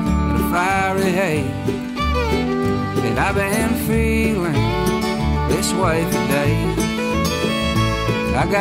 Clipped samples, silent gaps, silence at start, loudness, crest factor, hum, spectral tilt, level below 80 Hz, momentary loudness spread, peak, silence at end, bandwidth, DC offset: under 0.1%; none; 0 s; -19 LUFS; 12 dB; none; -5.5 dB/octave; -28 dBFS; 3 LU; -8 dBFS; 0 s; 16 kHz; under 0.1%